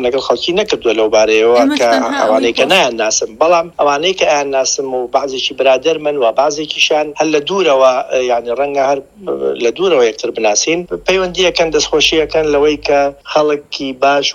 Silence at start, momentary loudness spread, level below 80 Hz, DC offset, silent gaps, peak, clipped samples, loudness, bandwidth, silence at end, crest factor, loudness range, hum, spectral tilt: 0 s; 6 LU; -44 dBFS; under 0.1%; none; 0 dBFS; under 0.1%; -13 LUFS; 13 kHz; 0 s; 12 dB; 2 LU; none; -2.5 dB/octave